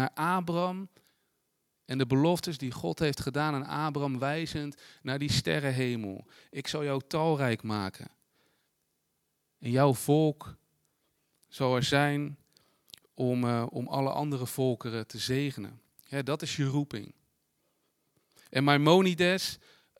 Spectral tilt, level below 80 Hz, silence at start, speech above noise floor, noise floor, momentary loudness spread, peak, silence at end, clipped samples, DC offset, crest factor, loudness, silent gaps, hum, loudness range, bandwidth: -5.5 dB/octave; -64 dBFS; 0 s; 49 dB; -78 dBFS; 15 LU; -6 dBFS; 0.45 s; under 0.1%; under 0.1%; 24 dB; -30 LUFS; none; none; 5 LU; 16.5 kHz